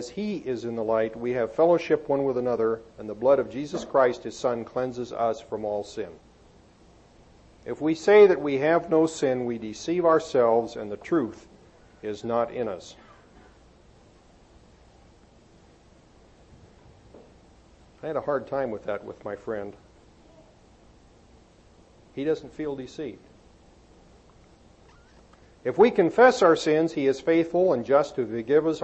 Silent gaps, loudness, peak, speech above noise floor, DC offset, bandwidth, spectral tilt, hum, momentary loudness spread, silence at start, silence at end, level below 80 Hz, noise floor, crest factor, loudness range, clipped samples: none; -25 LUFS; -6 dBFS; 31 dB; under 0.1%; 8.4 kHz; -6 dB/octave; none; 16 LU; 0 s; 0 s; -60 dBFS; -55 dBFS; 20 dB; 15 LU; under 0.1%